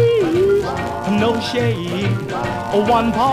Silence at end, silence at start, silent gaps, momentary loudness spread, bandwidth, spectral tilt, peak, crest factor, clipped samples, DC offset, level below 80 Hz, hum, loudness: 0 s; 0 s; none; 7 LU; 15.5 kHz; -6.5 dB/octave; -4 dBFS; 12 dB; under 0.1%; 0.2%; -40 dBFS; none; -18 LUFS